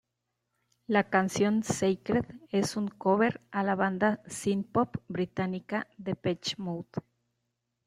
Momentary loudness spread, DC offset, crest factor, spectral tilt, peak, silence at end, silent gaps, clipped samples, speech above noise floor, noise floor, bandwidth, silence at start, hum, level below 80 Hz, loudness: 9 LU; under 0.1%; 22 dB; -5.5 dB/octave; -8 dBFS; 0.85 s; none; under 0.1%; 54 dB; -83 dBFS; 14 kHz; 0.9 s; 60 Hz at -55 dBFS; -66 dBFS; -30 LUFS